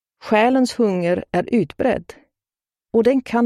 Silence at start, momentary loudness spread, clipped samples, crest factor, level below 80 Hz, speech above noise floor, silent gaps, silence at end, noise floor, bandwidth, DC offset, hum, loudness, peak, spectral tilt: 0.25 s; 5 LU; under 0.1%; 16 dB; -52 dBFS; over 72 dB; none; 0 s; under -90 dBFS; 12.5 kHz; under 0.1%; none; -19 LUFS; -2 dBFS; -6.5 dB/octave